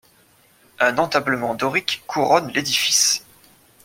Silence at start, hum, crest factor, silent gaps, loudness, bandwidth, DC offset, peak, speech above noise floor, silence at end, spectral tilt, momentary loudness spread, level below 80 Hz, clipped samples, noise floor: 0.8 s; none; 20 dB; none; -19 LUFS; 16.5 kHz; under 0.1%; -2 dBFS; 36 dB; 0.65 s; -1.5 dB/octave; 7 LU; -62 dBFS; under 0.1%; -56 dBFS